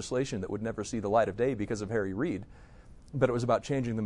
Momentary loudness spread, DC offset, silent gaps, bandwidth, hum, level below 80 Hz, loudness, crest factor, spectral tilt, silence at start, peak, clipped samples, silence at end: 7 LU; under 0.1%; none; 11 kHz; none; -54 dBFS; -31 LUFS; 18 dB; -6.5 dB/octave; 0 s; -12 dBFS; under 0.1%; 0 s